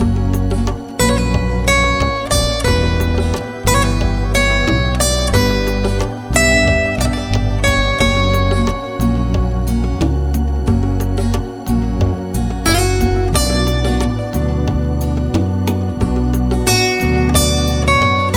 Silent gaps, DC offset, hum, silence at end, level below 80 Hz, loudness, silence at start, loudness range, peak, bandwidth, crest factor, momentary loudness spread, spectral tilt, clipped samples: none; under 0.1%; none; 0 s; -20 dBFS; -16 LUFS; 0 s; 3 LU; 0 dBFS; 18 kHz; 14 dB; 5 LU; -5 dB/octave; under 0.1%